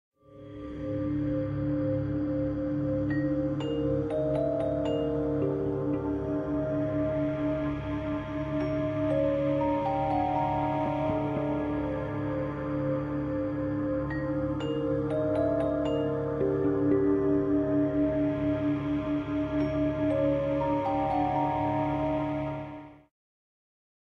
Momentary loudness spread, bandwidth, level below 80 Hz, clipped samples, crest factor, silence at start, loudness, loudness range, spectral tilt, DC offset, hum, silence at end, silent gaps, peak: 5 LU; 5.8 kHz; -46 dBFS; under 0.1%; 14 dB; 0.3 s; -29 LUFS; 3 LU; -9.5 dB/octave; under 0.1%; none; 1.1 s; none; -14 dBFS